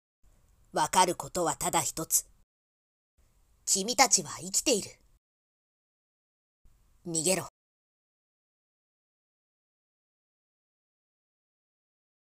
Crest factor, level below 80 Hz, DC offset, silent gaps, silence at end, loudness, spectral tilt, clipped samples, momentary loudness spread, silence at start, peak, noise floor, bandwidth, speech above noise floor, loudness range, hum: 28 dB; -64 dBFS; under 0.1%; 2.43-3.18 s, 5.18-6.65 s; 4.85 s; -27 LUFS; -1.5 dB/octave; under 0.1%; 13 LU; 0.75 s; -6 dBFS; -62 dBFS; 16 kHz; 34 dB; 8 LU; none